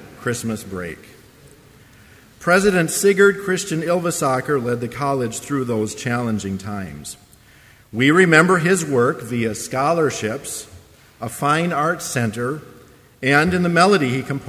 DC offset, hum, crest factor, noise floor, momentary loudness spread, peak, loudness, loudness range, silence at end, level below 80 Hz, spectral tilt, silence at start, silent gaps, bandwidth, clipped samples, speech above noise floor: under 0.1%; none; 20 dB; -49 dBFS; 16 LU; 0 dBFS; -19 LUFS; 6 LU; 0 s; -50 dBFS; -5 dB/octave; 0 s; none; 16 kHz; under 0.1%; 30 dB